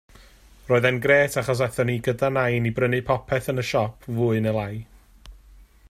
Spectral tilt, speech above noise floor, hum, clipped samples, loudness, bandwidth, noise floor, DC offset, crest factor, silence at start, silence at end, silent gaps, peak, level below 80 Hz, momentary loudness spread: -6 dB/octave; 28 dB; none; under 0.1%; -23 LUFS; 15.5 kHz; -50 dBFS; under 0.1%; 18 dB; 0.65 s; 0.55 s; none; -6 dBFS; -50 dBFS; 7 LU